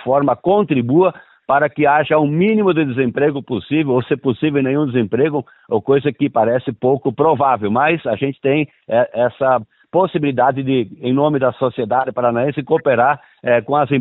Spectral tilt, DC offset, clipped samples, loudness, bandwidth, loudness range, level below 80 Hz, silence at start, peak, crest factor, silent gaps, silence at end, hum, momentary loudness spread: -12 dB/octave; under 0.1%; under 0.1%; -17 LUFS; 4.1 kHz; 2 LU; -58 dBFS; 0 s; -4 dBFS; 12 dB; none; 0 s; none; 5 LU